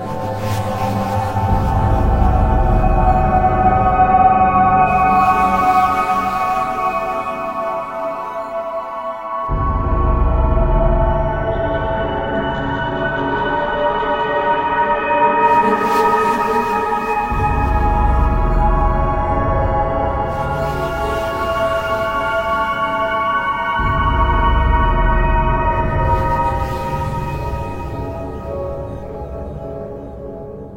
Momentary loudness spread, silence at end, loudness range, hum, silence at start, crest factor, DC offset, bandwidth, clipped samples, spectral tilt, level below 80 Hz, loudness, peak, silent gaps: 12 LU; 0 s; 8 LU; none; 0 s; 14 dB; under 0.1%; 16.5 kHz; under 0.1%; -7 dB/octave; -22 dBFS; -17 LUFS; -2 dBFS; none